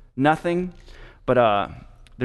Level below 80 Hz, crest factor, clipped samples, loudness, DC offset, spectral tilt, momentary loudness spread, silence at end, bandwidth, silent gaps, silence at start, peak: -46 dBFS; 18 dB; under 0.1%; -22 LUFS; under 0.1%; -7 dB/octave; 14 LU; 0 s; 12 kHz; none; 0.15 s; -4 dBFS